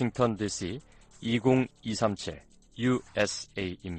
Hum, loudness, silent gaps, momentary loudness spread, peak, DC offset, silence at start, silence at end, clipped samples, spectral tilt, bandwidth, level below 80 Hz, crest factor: none; -30 LUFS; none; 13 LU; -12 dBFS; under 0.1%; 0 s; 0 s; under 0.1%; -5 dB/octave; 9.4 kHz; -56 dBFS; 18 dB